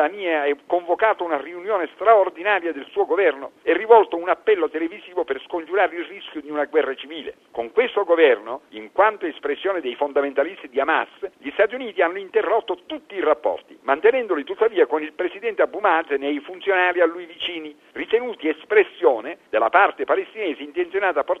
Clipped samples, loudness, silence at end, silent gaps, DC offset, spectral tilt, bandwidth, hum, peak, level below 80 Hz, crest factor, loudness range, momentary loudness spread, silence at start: under 0.1%; -21 LUFS; 0 s; none; under 0.1%; -5 dB/octave; 4.1 kHz; none; 0 dBFS; -66 dBFS; 20 dB; 4 LU; 12 LU; 0 s